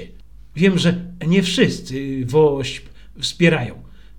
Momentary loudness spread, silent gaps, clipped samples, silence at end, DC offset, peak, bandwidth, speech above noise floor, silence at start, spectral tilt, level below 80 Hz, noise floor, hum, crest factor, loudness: 12 LU; none; under 0.1%; 0.3 s; 0.8%; 0 dBFS; 12 kHz; 25 dB; 0 s; -5.5 dB/octave; -44 dBFS; -43 dBFS; none; 18 dB; -18 LUFS